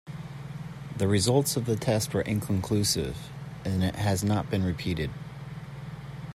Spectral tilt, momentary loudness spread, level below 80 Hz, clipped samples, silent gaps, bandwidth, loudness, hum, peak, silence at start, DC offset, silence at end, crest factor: -5 dB/octave; 16 LU; -52 dBFS; under 0.1%; none; 15 kHz; -28 LUFS; none; -10 dBFS; 0.05 s; under 0.1%; 0.05 s; 18 dB